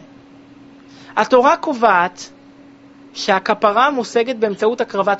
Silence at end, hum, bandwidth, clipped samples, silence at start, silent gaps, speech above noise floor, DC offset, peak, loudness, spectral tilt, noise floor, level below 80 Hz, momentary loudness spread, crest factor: 0 s; none; 8 kHz; under 0.1%; 1 s; none; 28 dB; under 0.1%; 0 dBFS; -16 LUFS; -2 dB/octave; -44 dBFS; -62 dBFS; 11 LU; 18 dB